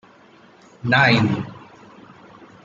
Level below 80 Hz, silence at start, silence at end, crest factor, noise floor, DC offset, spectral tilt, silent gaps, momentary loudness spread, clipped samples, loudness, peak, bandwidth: -58 dBFS; 0.85 s; 1.05 s; 20 dB; -50 dBFS; under 0.1%; -6.5 dB/octave; none; 16 LU; under 0.1%; -18 LUFS; -2 dBFS; 7.6 kHz